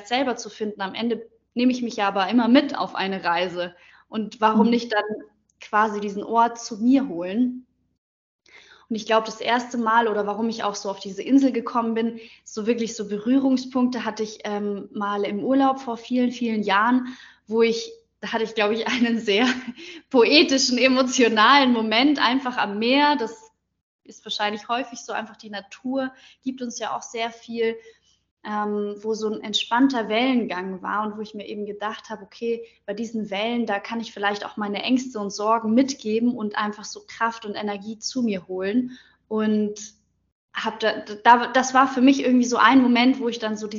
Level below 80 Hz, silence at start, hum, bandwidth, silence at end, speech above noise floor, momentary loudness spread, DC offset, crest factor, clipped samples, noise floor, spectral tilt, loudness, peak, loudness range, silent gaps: -70 dBFS; 0 s; none; 7.6 kHz; 0 s; 29 dB; 14 LU; under 0.1%; 22 dB; under 0.1%; -51 dBFS; -2 dB/octave; -22 LUFS; 0 dBFS; 10 LU; 7.98-8.39 s, 23.81-23.99 s, 28.31-28.37 s, 40.32-40.48 s